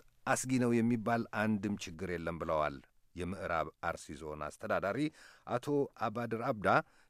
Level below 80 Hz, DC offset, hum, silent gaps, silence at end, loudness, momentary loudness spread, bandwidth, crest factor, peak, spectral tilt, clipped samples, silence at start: -62 dBFS; under 0.1%; none; none; 0.3 s; -35 LUFS; 12 LU; 14.5 kHz; 22 dB; -14 dBFS; -5.5 dB/octave; under 0.1%; 0.25 s